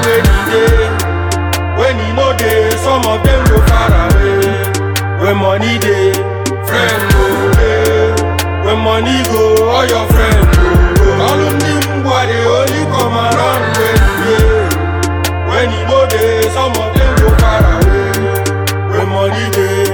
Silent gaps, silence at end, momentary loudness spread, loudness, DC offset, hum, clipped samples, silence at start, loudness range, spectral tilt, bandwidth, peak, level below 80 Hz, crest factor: none; 0 s; 5 LU; -11 LUFS; under 0.1%; none; under 0.1%; 0 s; 2 LU; -5.5 dB/octave; 19.5 kHz; 0 dBFS; -16 dBFS; 10 dB